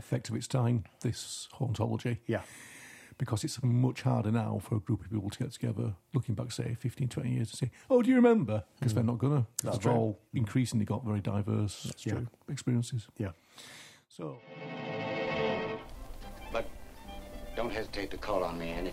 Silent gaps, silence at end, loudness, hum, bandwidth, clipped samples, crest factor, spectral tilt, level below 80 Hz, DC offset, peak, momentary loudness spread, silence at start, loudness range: none; 0 s; -33 LUFS; none; 14.5 kHz; under 0.1%; 22 dB; -6.5 dB/octave; -54 dBFS; under 0.1%; -10 dBFS; 17 LU; 0 s; 9 LU